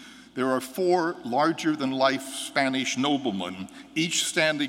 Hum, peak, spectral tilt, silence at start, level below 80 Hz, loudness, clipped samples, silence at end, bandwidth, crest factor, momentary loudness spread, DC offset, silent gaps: none; -8 dBFS; -3.5 dB/octave; 0 s; -70 dBFS; -26 LUFS; under 0.1%; 0 s; 16.5 kHz; 18 dB; 9 LU; under 0.1%; none